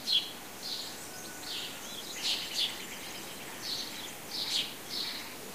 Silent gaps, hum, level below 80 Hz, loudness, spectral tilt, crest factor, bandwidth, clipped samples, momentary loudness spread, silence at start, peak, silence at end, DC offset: none; none; -70 dBFS; -35 LUFS; -0.5 dB/octave; 22 dB; 15.5 kHz; under 0.1%; 10 LU; 0 s; -16 dBFS; 0 s; 0.2%